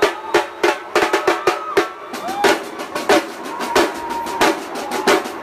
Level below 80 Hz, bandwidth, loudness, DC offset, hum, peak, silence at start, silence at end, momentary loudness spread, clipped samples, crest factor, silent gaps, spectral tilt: -52 dBFS; 15.5 kHz; -19 LUFS; under 0.1%; none; -2 dBFS; 0 s; 0 s; 9 LU; under 0.1%; 16 dB; none; -2.5 dB/octave